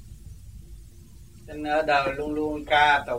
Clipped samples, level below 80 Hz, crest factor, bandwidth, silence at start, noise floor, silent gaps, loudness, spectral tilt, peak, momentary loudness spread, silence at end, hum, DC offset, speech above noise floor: under 0.1%; -46 dBFS; 20 dB; 16 kHz; 0 s; -48 dBFS; none; -24 LUFS; -4.5 dB/octave; -6 dBFS; 26 LU; 0 s; none; 0.2%; 24 dB